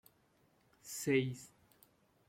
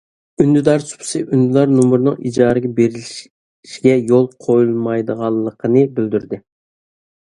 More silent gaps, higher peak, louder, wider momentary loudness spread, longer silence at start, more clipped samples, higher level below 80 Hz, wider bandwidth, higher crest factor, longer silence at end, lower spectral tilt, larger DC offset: second, none vs 3.30-3.63 s; second, -20 dBFS vs 0 dBFS; second, -37 LUFS vs -15 LUFS; first, 23 LU vs 11 LU; first, 0.85 s vs 0.4 s; neither; second, -78 dBFS vs -54 dBFS; first, 16.5 kHz vs 11.5 kHz; about the same, 20 dB vs 16 dB; about the same, 0.8 s vs 0.8 s; second, -5 dB/octave vs -7 dB/octave; neither